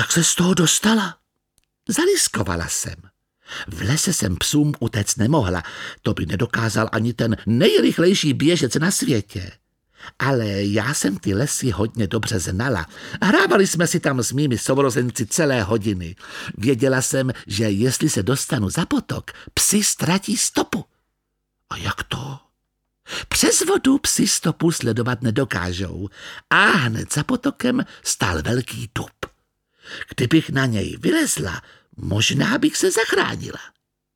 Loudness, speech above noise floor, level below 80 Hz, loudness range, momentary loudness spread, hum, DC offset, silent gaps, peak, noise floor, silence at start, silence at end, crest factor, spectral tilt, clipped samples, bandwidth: -20 LUFS; 55 dB; -46 dBFS; 4 LU; 14 LU; none; under 0.1%; none; -2 dBFS; -75 dBFS; 0 s; 0.5 s; 20 dB; -4 dB/octave; under 0.1%; 18.5 kHz